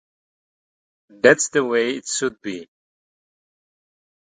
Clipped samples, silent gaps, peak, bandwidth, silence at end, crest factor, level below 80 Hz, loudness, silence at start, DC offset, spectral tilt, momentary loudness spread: under 0.1%; none; 0 dBFS; 9.6 kHz; 1.7 s; 24 dB; -68 dBFS; -19 LUFS; 1.25 s; under 0.1%; -3 dB/octave; 17 LU